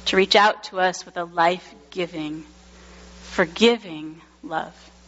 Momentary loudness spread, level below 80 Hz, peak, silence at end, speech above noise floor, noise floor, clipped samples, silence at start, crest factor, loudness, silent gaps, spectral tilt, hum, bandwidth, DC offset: 20 LU; -54 dBFS; -2 dBFS; 0.35 s; 24 dB; -46 dBFS; under 0.1%; 0 s; 22 dB; -22 LUFS; none; -1.5 dB/octave; none; 8 kHz; under 0.1%